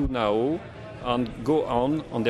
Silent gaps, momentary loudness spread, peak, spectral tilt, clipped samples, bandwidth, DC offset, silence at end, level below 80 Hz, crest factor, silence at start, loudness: none; 9 LU; -10 dBFS; -7.5 dB/octave; under 0.1%; 12 kHz; under 0.1%; 0 s; -42 dBFS; 16 dB; 0 s; -26 LUFS